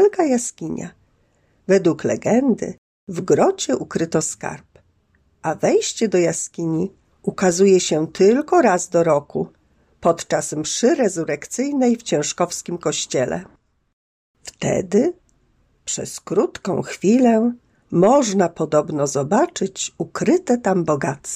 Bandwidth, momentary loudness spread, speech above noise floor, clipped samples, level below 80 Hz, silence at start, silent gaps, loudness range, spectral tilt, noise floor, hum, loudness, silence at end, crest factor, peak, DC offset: 14.5 kHz; 13 LU; 43 dB; under 0.1%; -58 dBFS; 0 s; 2.78-3.07 s, 13.93-14.34 s; 5 LU; -5 dB/octave; -61 dBFS; none; -19 LUFS; 0 s; 16 dB; -4 dBFS; under 0.1%